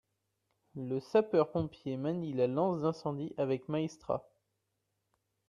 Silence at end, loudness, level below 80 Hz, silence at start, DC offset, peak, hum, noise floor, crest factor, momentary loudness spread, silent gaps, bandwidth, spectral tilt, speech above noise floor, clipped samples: 1.25 s; -34 LUFS; -70 dBFS; 0.75 s; under 0.1%; -14 dBFS; none; -83 dBFS; 20 dB; 8 LU; none; 10.5 kHz; -8 dB/octave; 50 dB; under 0.1%